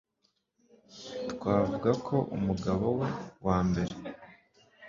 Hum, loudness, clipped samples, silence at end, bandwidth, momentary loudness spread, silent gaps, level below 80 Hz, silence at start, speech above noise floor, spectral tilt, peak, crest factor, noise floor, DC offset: none; -31 LUFS; under 0.1%; 0 s; 7.4 kHz; 14 LU; none; -52 dBFS; 0.9 s; 47 dB; -7.5 dB/octave; -12 dBFS; 20 dB; -76 dBFS; under 0.1%